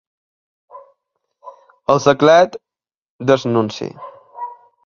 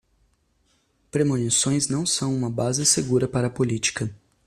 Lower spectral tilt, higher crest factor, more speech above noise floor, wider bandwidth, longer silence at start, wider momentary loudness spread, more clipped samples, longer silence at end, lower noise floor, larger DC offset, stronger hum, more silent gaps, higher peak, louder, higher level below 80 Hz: first, -5.5 dB/octave vs -4 dB/octave; about the same, 18 dB vs 18 dB; first, 76 dB vs 43 dB; second, 7.4 kHz vs 14.5 kHz; second, 0.75 s vs 1.15 s; first, 23 LU vs 6 LU; neither; about the same, 0.3 s vs 0.3 s; first, -90 dBFS vs -66 dBFS; neither; neither; first, 2.98-3.19 s vs none; first, 0 dBFS vs -6 dBFS; first, -15 LUFS vs -22 LUFS; about the same, -58 dBFS vs -56 dBFS